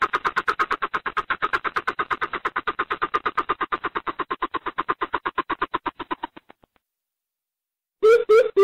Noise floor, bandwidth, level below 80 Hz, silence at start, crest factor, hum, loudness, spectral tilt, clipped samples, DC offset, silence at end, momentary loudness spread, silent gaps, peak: -88 dBFS; 11.5 kHz; -58 dBFS; 0 s; 16 dB; none; -24 LUFS; -4 dB/octave; under 0.1%; 0.1%; 0 s; 11 LU; none; -8 dBFS